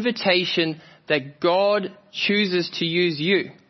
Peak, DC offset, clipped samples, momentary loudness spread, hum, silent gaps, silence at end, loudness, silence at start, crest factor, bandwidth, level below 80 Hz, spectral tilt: -4 dBFS; under 0.1%; under 0.1%; 6 LU; none; none; 0.15 s; -21 LUFS; 0 s; 18 dB; 6.2 kHz; -72 dBFS; -5.5 dB/octave